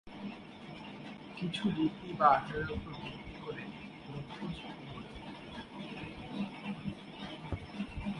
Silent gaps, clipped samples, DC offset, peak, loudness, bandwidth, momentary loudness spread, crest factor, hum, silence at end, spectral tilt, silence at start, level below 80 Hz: none; under 0.1%; under 0.1%; -12 dBFS; -38 LUFS; 11 kHz; 15 LU; 26 dB; none; 0 s; -6.5 dB/octave; 0.05 s; -56 dBFS